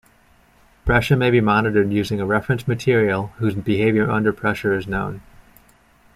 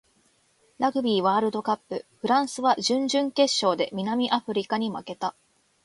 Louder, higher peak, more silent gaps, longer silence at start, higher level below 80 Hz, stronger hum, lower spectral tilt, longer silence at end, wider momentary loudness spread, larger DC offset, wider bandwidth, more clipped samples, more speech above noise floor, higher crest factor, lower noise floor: first, -19 LUFS vs -25 LUFS; first, -4 dBFS vs -8 dBFS; neither; about the same, 0.85 s vs 0.8 s; first, -40 dBFS vs -72 dBFS; neither; first, -7 dB/octave vs -4 dB/octave; first, 0.95 s vs 0.55 s; about the same, 8 LU vs 9 LU; neither; first, 15 kHz vs 11.5 kHz; neither; second, 36 dB vs 40 dB; about the same, 16 dB vs 18 dB; second, -55 dBFS vs -65 dBFS